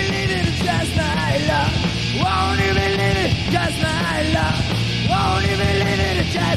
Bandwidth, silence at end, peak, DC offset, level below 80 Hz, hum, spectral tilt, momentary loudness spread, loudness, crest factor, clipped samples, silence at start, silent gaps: 14 kHz; 0 s; -6 dBFS; 0.4%; -32 dBFS; none; -5 dB/octave; 2 LU; -19 LUFS; 14 dB; under 0.1%; 0 s; none